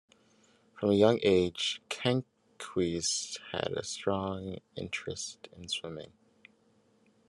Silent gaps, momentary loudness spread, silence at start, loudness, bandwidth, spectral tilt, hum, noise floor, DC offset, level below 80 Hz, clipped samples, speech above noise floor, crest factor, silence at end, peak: none; 17 LU; 0.75 s; -31 LUFS; 12 kHz; -4 dB/octave; none; -68 dBFS; under 0.1%; -72 dBFS; under 0.1%; 36 dB; 22 dB; 1.25 s; -10 dBFS